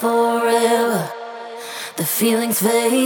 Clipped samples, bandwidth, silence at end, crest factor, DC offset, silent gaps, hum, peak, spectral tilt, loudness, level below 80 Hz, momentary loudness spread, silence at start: under 0.1%; over 20 kHz; 0 s; 14 dB; under 0.1%; none; none; -4 dBFS; -3.5 dB/octave; -18 LUFS; -80 dBFS; 15 LU; 0 s